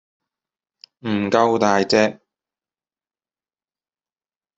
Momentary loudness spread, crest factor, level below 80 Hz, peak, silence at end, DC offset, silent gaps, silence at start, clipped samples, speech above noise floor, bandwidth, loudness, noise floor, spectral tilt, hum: 8 LU; 22 dB; -64 dBFS; -2 dBFS; 2.45 s; under 0.1%; none; 1.05 s; under 0.1%; over 72 dB; 7.8 kHz; -18 LUFS; under -90 dBFS; -5 dB/octave; none